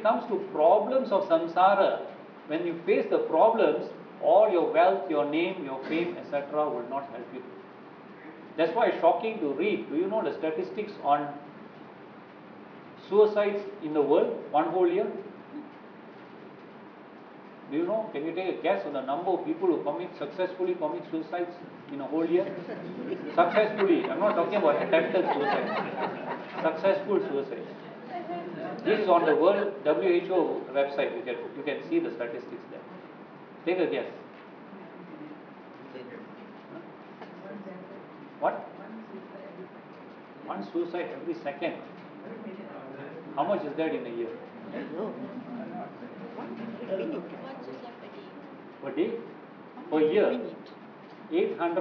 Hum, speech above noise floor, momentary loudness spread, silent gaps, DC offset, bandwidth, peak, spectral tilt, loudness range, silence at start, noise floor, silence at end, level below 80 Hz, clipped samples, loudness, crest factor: none; 21 dB; 23 LU; none; under 0.1%; 5.4 kHz; -10 dBFS; -8 dB/octave; 12 LU; 0 s; -48 dBFS; 0 s; -88 dBFS; under 0.1%; -28 LUFS; 20 dB